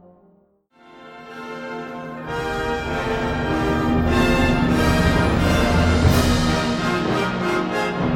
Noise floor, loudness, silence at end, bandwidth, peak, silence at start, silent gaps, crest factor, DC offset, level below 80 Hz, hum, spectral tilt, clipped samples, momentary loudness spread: -58 dBFS; -20 LUFS; 0 s; 17.5 kHz; -4 dBFS; 0.95 s; none; 16 dB; under 0.1%; -30 dBFS; none; -6 dB/octave; under 0.1%; 14 LU